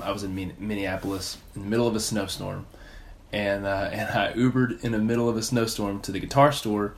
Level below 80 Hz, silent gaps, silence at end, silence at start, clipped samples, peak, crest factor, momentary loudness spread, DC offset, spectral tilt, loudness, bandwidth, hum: -48 dBFS; none; 0 s; 0 s; under 0.1%; -4 dBFS; 22 dB; 12 LU; under 0.1%; -5 dB/octave; -26 LUFS; 16 kHz; none